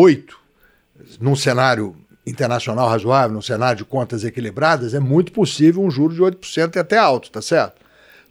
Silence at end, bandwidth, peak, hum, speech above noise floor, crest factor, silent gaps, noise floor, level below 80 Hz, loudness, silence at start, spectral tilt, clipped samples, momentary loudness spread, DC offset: 0.6 s; 15 kHz; -2 dBFS; none; 40 dB; 16 dB; none; -57 dBFS; -60 dBFS; -18 LUFS; 0 s; -6 dB/octave; under 0.1%; 9 LU; under 0.1%